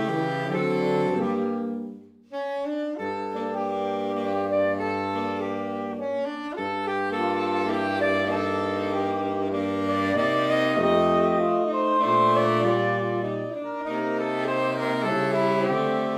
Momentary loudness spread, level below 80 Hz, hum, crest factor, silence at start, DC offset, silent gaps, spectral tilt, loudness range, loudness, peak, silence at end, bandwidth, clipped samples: 9 LU; -66 dBFS; none; 16 dB; 0 s; under 0.1%; none; -6.5 dB/octave; 6 LU; -25 LUFS; -10 dBFS; 0 s; 14.5 kHz; under 0.1%